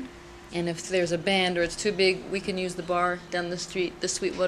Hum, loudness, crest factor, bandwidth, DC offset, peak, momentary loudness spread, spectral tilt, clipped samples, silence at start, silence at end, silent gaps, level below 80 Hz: none; -27 LUFS; 18 dB; 13 kHz; under 0.1%; -10 dBFS; 8 LU; -3.5 dB/octave; under 0.1%; 0 s; 0 s; none; -54 dBFS